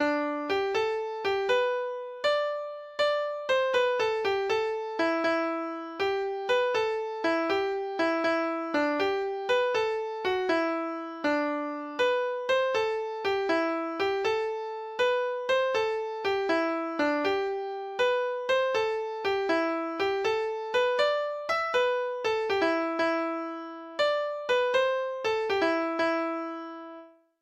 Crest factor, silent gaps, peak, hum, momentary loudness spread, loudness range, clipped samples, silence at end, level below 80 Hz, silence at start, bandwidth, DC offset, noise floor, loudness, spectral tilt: 14 dB; none; -14 dBFS; none; 7 LU; 1 LU; under 0.1%; 0.35 s; -68 dBFS; 0 s; 9 kHz; under 0.1%; -49 dBFS; -28 LUFS; -3.5 dB/octave